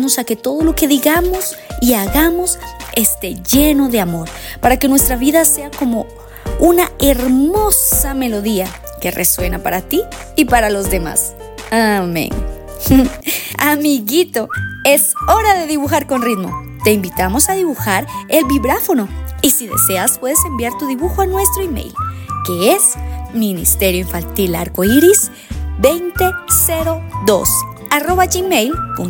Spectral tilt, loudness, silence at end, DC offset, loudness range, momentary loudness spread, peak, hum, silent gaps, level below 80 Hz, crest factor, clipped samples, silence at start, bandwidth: -3.5 dB/octave; -14 LUFS; 0 s; under 0.1%; 2 LU; 10 LU; 0 dBFS; none; none; -28 dBFS; 14 dB; under 0.1%; 0 s; 18.5 kHz